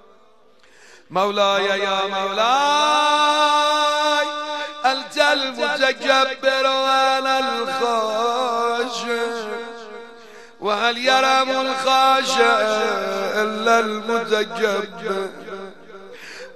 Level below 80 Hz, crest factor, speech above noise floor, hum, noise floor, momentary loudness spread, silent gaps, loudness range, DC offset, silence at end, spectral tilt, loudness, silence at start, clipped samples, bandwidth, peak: -72 dBFS; 16 dB; 36 dB; none; -54 dBFS; 12 LU; none; 5 LU; 0.3%; 0 s; -2 dB/octave; -19 LUFS; 1.1 s; under 0.1%; 13 kHz; -4 dBFS